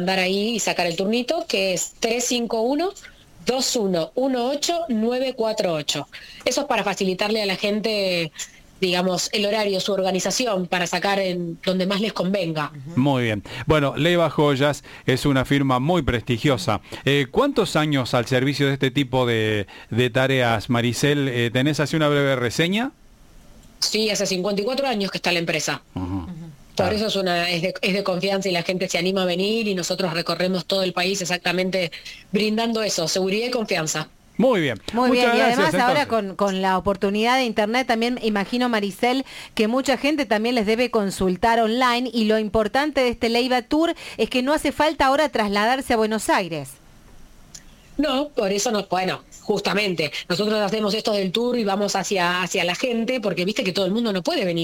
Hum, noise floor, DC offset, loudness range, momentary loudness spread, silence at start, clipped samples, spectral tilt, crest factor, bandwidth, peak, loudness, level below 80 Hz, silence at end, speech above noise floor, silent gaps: none; -47 dBFS; under 0.1%; 3 LU; 6 LU; 0 s; under 0.1%; -4.5 dB/octave; 14 dB; 17 kHz; -6 dBFS; -21 LUFS; -48 dBFS; 0 s; 26 dB; none